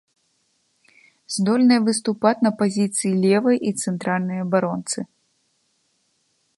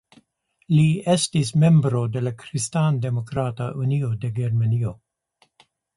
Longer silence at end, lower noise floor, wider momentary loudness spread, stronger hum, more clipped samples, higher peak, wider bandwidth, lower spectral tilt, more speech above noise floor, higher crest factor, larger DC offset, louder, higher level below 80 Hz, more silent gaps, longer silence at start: first, 1.55 s vs 1.05 s; about the same, -68 dBFS vs -65 dBFS; about the same, 10 LU vs 10 LU; neither; neither; first, -4 dBFS vs -8 dBFS; about the same, 11.5 kHz vs 11.5 kHz; second, -5 dB/octave vs -6.5 dB/octave; first, 48 dB vs 44 dB; about the same, 18 dB vs 14 dB; neither; about the same, -20 LUFS vs -22 LUFS; second, -70 dBFS vs -54 dBFS; neither; first, 1.3 s vs 0.7 s